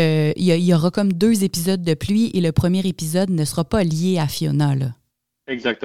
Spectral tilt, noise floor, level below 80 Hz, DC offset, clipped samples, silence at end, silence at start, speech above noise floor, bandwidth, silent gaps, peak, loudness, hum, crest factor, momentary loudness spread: -6 dB/octave; -44 dBFS; -44 dBFS; 0.5%; under 0.1%; 0 s; 0 s; 26 dB; 16 kHz; none; -2 dBFS; -19 LUFS; none; 16 dB; 4 LU